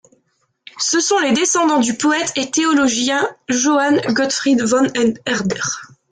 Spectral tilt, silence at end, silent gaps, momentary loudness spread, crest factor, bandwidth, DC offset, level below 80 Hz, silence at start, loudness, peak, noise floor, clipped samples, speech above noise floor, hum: -2.5 dB/octave; 0.25 s; none; 6 LU; 12 dB; 9.6 kHz; under 0.1%; -58 dBFS; 0.75 s; -16 LUFS; -4 dBFS; -65 dBFS; under 0.1%; 48 dB; none